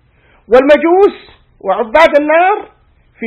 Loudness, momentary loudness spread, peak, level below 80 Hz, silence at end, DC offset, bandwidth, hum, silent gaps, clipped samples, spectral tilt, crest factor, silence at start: -10 LUFS; 10 LU; 0 dBFS; -44 dBFS; 0 s; under 0.1%; 9.8 kHz; none; none; 0.9%; -5 dB/octave; 12 dB; 0.5 s